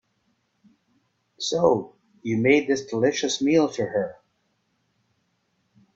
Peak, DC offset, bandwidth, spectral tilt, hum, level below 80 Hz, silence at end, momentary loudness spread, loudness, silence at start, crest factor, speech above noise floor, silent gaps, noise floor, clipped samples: -6 dBFS; under 0.1%; 8 kHz; -4.5 dB/octave; none; -66 dBFS; 1.85 s; 11 LU; -23 LUFS; 1.4 s; 20 dB; 49 dB; none; -71 dBFS; under 0.1%